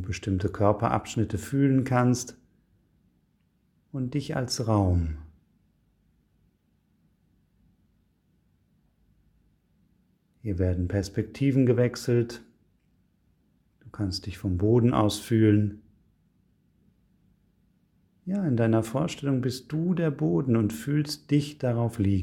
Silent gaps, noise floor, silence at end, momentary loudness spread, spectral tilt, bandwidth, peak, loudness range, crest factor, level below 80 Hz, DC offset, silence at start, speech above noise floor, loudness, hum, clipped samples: none; -69 dBFS; 0 s; 10 LU; -7 dB/octave; 16 kHz; -8 dBFS; 6 LU; 20 dB; -50 dBFS; under 0.1%; 0 s; 44 dB; -26 LUFS; 50 Hz at -60 dBFS; under 0.1%